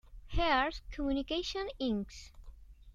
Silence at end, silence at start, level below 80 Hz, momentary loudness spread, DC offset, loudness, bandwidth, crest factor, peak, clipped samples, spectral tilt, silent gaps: 0 s; 0.05 s; -46 dBFS; 15 LU; under 0.1%; -34 LUFS; 8.8 kHz; 18 dB; -16 dBFS; under 0.1%; -5 dB/octave; none